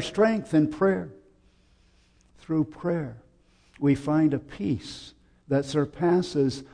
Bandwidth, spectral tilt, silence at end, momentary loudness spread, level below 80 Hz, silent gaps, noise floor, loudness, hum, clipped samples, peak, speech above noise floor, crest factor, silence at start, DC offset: 10 kHz; -7 dB/octave; 0.1 s; 9 LU; -56 dBFS; none; -61 dBFS; -26 LUFS; none; under 0.1%; -10 dBFS; 36 dB; 16 dB; 0 s; under 0.1%